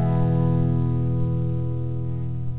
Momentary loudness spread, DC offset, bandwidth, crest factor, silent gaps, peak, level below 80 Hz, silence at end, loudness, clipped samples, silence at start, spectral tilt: 7 LU; 3%; 4 kHz; 12 dB; none; -10 dBFS; -38 dBFS; 0 s; -24 LUFS; under 0.1%; 0 s; -13.5 dB/octave